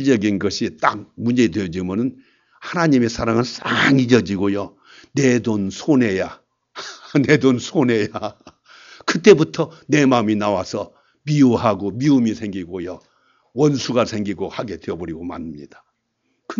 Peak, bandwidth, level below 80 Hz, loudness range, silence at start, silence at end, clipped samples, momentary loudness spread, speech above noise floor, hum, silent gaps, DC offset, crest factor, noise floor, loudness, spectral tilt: 0 dBFS; 7.6 kHz; -52 dBFS; 5 LU; 0 s; 0.05 s; under 0.1%; 16 LU; 52 dB; none; none; under 0.1%; 20 dB; -70 dBFS; -19 LUFS; -6 dB/octave